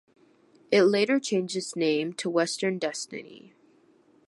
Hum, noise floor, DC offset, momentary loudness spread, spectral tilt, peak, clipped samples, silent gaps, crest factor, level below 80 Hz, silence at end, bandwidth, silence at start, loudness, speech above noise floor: none; -61 dBFS; under 0.1%; 11 LU; -4 dB/octave; -8 dBFS; under 0.1%; none; 20 dB; -80 dBFS; 0.9 s; 11.5 kHz; 0.7 s; -26 LUFS; 35 dB